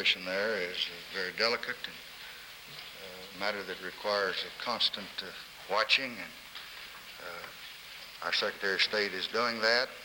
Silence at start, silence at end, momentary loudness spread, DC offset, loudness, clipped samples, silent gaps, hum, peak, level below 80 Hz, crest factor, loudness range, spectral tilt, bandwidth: 0 s; 0 s; 17 LU; under 0.1%; -31 LUFS; under 0.1%; none; none; -12 dBFS; -70 dBFS; 22 dB; 4 LU; -2 dB/octave; over 20 kHz